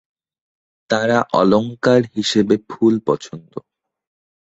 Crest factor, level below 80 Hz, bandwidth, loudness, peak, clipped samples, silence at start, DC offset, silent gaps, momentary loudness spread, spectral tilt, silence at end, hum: 18 dB; -58 dBFS; 8.2 kHz; -17 LUFS; 0 dBFS; under 0.1%; 0.9 s; under 0.1%; none; 17 LU; -5.5 dB/octave; 1 s; none